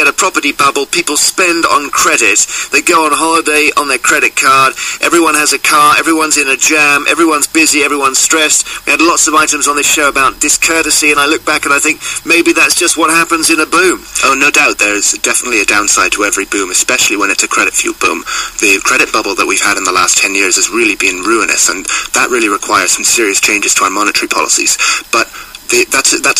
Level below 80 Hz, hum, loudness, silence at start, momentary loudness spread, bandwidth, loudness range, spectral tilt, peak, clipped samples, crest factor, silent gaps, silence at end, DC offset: -44 dBFS; none; -8 LUFS; 0 s; 4 LU; 16 kHz; 2 LU; -0.5 dB/octave; 0 dBFS; under 0.1%; 10 dB; none; 0 s; under 0.1%